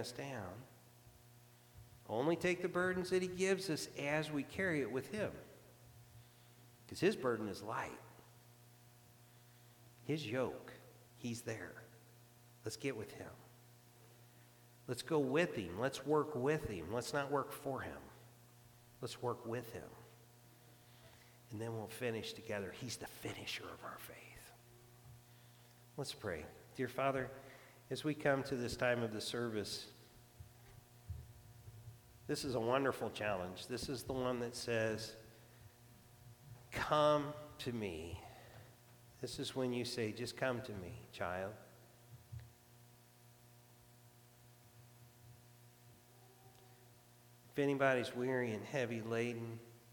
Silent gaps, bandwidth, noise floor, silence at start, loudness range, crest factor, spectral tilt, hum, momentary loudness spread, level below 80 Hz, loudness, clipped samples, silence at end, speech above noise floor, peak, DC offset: none; 19 kHz; -65 dBFS; 0 s; 10 LU; 24 dB; -5 dB/octave; 60 Hz at -65 dBFS; 25 LU; -68 dBFS; -41 LUFS; under 0.1%; 0 s; 25 dB; -18 dBFS; under 0.1%